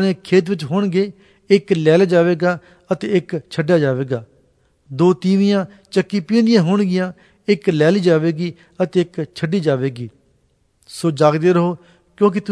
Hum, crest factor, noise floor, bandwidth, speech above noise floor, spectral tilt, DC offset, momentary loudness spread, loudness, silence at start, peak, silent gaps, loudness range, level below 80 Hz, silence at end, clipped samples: none; 16 dB; -61 dBFS; 11 kHz; 44 dB; -7 dB/octave; under 0.1%; 11 LU; -17 LUFS; 0 s; 0 dBFS; none; 3 LU; -62 dBFS; 0 s; under 0.1%